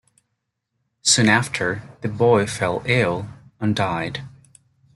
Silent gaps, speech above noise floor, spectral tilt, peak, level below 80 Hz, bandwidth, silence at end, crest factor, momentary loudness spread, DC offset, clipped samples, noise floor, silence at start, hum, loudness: none; 56 dB; -4 dB/octave; -2 dBFS; -54 dBFS; 12 kHz; 0.65 s; 20 dB; 14 LU; under 0.1%; under 0.1%; -77 dBFS; 1.05 s; none; -20 LUFS